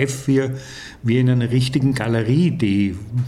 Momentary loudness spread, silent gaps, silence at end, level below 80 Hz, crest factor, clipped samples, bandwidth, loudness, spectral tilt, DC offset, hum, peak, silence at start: 9 LU; none; 0 s; -48 dBFS; 14 dB; under 0.1%; 12.5 kHz; -19 LUFS; -7 dB/octave; under 0.1%; none; -4 dBFS; 0 s